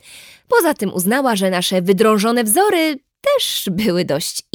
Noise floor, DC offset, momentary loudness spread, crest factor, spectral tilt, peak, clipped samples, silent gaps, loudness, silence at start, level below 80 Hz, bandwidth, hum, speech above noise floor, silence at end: -42 dBFS; under 0.1%; 5 LU; 16 dB; -4 dB/octave; -2 dBFS; under 0.1%; none; -16 LUFS; 0.1 s; -58 dBFS; over 20 kHz; none; 26 dB; 0.15 s